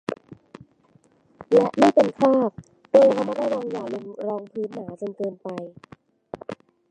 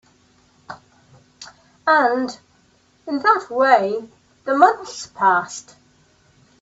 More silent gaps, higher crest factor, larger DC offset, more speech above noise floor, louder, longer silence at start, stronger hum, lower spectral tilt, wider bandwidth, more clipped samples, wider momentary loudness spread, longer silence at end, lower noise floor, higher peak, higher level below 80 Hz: neither; about the same, 22 dB vs 20 dB; neither; about the same, 38 dB vs 40 dB; second, -22 LUFS vs -18 LUFS; second, 0.1 s vs 0.7 s; neither; first, -6.5 dB/octave vs -3.5 dB/octave; first, 9.6 kHz vs 8 kHz; neither; second, 21 LU vs 25 LU; second, 0.35 s vs 1 s; about the same, -59 dBFS vs -58 dBFS; about the same, -2 dBFS vs 0 dBFS; about the same, -66 dBFS vs -68 dBFS